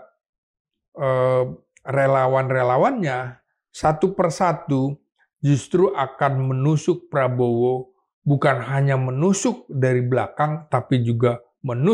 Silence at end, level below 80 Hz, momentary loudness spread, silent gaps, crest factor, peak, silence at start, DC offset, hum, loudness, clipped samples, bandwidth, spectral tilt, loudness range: 0 s; -56 dBFS; 8 LU; 8.13-8.22 s; 16 dB; -4 dBFS; 0.95 s; under 0.1%; none; -21 LUFS; under 0.1%; 10.5 kHz; -7 dB/octave; 1 LU